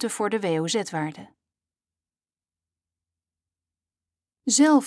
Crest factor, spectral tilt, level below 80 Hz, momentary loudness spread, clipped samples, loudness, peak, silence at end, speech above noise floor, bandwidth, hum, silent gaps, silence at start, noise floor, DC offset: 18 dB; -3.5 dB/octave; -80 dBFS; 13 LU; under 0.1%; -24 LUFS; -8 dBFS; 0 s; over 67 dB; 11 kHz; none; none; 0 s; under -90 dBFS; under 0.1%